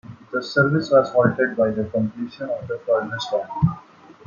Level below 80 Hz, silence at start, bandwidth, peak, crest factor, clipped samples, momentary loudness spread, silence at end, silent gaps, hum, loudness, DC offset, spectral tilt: -52 dBFS; 0.1 s; 7.2 kHz; -4 dBFS; 18 dB; under 0.1%; 11 LU; 0.15 s; none; none; -21 LUFS; under 0.1%; -7 dB/octave